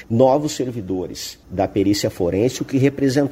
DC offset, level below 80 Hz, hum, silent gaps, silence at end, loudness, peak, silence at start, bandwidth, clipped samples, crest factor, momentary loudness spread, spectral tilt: under 0.1%; -48 dBFS; none; none; 0 s; -20 LUFS; -2 dBFS; 0 s; 16 kHz; under 0.1%; 18 dB; 10 LU; -6 dB/octave